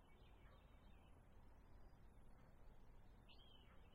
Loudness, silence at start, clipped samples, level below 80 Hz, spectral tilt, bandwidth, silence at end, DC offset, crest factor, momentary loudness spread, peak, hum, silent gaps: -69 LUFS; 0 s; under 0.1%; -68 dBFS; -6 dB/octave; 11.5 kHz; 0 s; under 0.1%; 12 dB; 2 LU; -52 dBFS; none; none